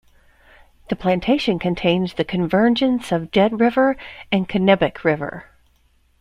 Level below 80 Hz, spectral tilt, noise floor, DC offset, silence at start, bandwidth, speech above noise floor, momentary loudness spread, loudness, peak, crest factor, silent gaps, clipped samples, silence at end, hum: -48 dBFS; -7 dB/octave; -59 dBFS; under 0.1%; 0.9 s; 11.5 kHz; 40 dB; 8 LU; -19 LUFS; -2 dBFS; 18 dB; none; under 0.1%; 0.8 s; none